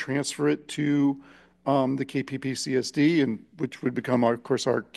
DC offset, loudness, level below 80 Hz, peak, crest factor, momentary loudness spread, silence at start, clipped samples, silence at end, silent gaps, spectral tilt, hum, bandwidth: under 0.1%; -26 LUFS; -68 dBFS; -8 dBFS; 16 dB; 8 LU; 0 s; under 0.1%; 0.15 s; none; -5.5 dB/octave; none; 12.5 kHz